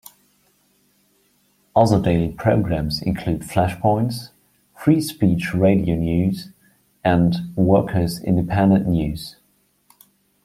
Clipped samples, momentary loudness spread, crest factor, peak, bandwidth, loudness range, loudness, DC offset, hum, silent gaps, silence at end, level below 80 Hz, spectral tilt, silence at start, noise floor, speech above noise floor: under 0.1%; 8 LU; 18 dB; -2 dBFS; 15.5 kHz; 2 LU; -19 LUFS; under 0.1%; none; none; 1.15 s; -42 dBFS; -7.5 dB/octave; 1.75 s; -63 dBFS; 44 dB